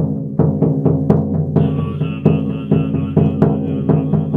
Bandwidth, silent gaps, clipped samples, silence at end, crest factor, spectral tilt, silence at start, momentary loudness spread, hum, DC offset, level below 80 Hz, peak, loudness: 3.6 kHz; none; under 0.1%; 0 s; 16 dB; -11.5 dB/octave; 0 s; 4 LU; none; under 0.1%; -42 dBFS; 0 dBFS; -16 LUFS